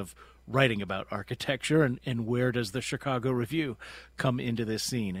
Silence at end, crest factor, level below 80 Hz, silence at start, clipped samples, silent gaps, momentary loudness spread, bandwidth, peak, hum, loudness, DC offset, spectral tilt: 0 s; 24 dB; -58 dBFS; 0 s; under 0.1%; none; 9 LU; 16 kHz; -6 dBFS; none; -30 LUFS; under 0.1%; -5.5 dB/octave